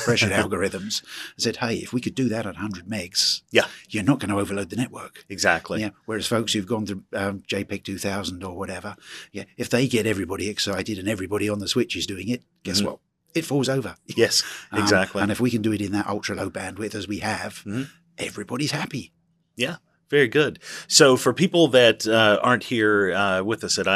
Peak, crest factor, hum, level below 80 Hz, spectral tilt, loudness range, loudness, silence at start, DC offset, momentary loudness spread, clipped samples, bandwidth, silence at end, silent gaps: 0 dBFS; 24 dB; none; -62 dBFS; -3.5 dB/octave; 10 LU; -23 LUFS; 0 s; under 0.1%; 13 LU; under 0.1%; 14 kHz; 0 s; none